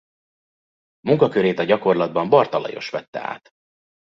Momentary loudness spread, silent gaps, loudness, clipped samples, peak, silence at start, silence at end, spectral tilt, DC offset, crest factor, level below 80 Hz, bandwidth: 13 LU; 3.08-3.13 s; -20 LUFS; under 0.1%; 0 dBFS; 1.05 s; 0.8 s; -7.5 dB/octave; under 0.1%; 20 dB; -64 dBFS; 6.6 kHz